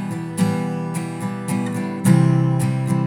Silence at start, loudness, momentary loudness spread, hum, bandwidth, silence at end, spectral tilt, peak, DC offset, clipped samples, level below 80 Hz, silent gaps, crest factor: 0 s; -20 LUFS; 11 LU; none; 16 kHz; 0 s; -7 dB/octave; -2 dBFS; under 0.1%; under 0.1%; -70 dBFS; none; 18 dB